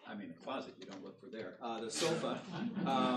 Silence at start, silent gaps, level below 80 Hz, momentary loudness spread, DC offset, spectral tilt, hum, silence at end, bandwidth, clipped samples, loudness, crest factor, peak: 0 s; none; -84 dBFS; 14 LU; under 0.1%; -4.5 dB/octave; none; 0 s; 13 kHz; under 0.1%; -40 LUFS; 16 dB; -22 dBFS